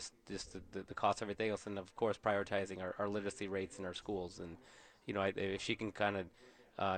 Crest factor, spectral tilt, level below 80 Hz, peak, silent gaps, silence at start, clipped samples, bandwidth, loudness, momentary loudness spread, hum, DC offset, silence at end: 22 dB; -4.5 dB/octave; -68 dBFS; -18 dBFS; none; 0 s; under 0.1%; 9.6 kHz; -40 LUFS; 12 LU; none; under 0.1%; 0 s